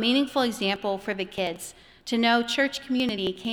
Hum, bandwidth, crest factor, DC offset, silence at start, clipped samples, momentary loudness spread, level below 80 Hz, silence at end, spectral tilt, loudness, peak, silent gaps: none; 20 kHz; 18 dB; under 0.1%; 0 s; under 0.1%; 9 LU; -60 dBFS; 0 s; -3.5 dB/octave; -26 LUFS; -8 dBFS; none